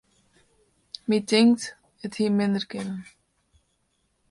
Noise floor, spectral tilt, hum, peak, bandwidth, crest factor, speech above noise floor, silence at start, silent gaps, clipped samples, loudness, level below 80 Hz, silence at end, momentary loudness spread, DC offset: -72 dBFS; -5 dB/octave; none; -8 dBFS; 11.5 kHz; 20 dB; 48 dB; 1.1 s; none; under 0.1%; -24 LUFS; -68 dBFS; 1.3 s; 19 LU; under 0.1%